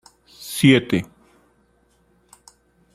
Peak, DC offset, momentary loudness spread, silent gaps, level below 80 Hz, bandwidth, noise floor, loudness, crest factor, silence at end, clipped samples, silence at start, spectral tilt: -2 dBFS; under 0.1%; 24 LU; none; -58 dBFS; 15.5 kHz; -61 dBFS; -18 LUFS; 22 dB; 1.9 s; under 0.1%; 0.4 s; -5.5 dB/octave